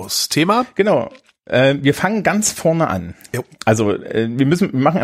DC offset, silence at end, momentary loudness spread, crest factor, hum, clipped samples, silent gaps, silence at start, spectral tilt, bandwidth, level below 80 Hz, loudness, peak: under 0.1%; 0 s; 8 LU; 16 dB; none; under 0.1%; none; 0 s; -4.5 dB/octave; 16 kHz; -52 dBFS; -17 LUFS; -2 dBFS